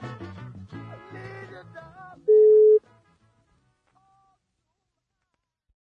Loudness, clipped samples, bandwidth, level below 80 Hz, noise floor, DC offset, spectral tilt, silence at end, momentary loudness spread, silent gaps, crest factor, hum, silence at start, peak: -18 LUFS; under 0.1%; 3.9 kHz; -70 dBFS; -80 dBFS; under 0.1%; -8.5 dB/octave; 3.2 s; 27 LU; none; 14 dB; none; 0 s; -12 dBFS